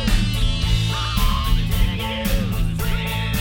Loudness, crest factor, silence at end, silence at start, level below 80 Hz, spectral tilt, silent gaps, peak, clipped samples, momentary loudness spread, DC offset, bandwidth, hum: -22 LUFS; 16 dB; 0 s; 0 s; -22 dBFS; -5 dB/octave; none; -4 dBFS; under 0.1%; 3 LU; under 0.1%; 17 kHz; none